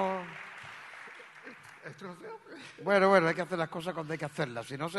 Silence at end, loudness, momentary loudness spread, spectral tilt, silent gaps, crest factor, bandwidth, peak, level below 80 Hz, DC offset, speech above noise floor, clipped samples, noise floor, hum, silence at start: 0 s; -30 LUFS; 23 LU; -5.5 dB/octave; none; 24 dB; 12 kHz; -8 dBFS; -74 dBFS; under 0.1%; 20 dB; under 0.1%; -51 dBFS; none; 0 s